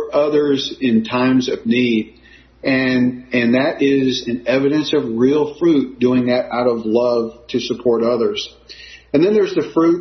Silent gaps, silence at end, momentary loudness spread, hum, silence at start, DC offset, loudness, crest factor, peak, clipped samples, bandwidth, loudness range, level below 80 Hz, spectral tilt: none; 0 s; 7 LU; none; 0 s; under 0.1%; -17 LUFS; 14 dB; -2 dBFS; under 0.1%; 6.4 kHz; 2 LU; -52 dBFS; -6 dB/octave